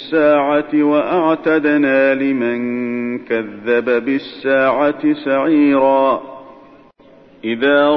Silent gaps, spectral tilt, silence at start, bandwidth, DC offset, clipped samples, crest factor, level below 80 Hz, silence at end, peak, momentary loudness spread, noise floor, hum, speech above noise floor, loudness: none; -8 dB/octave; 0 s; 5.6 kHz; under 0.1%; under 0.1%; 12 dB; -56 dBFS; 0 s; -2 dBFS; 8 LU; -45 dBFS; none; 31 dB; -15 LUFS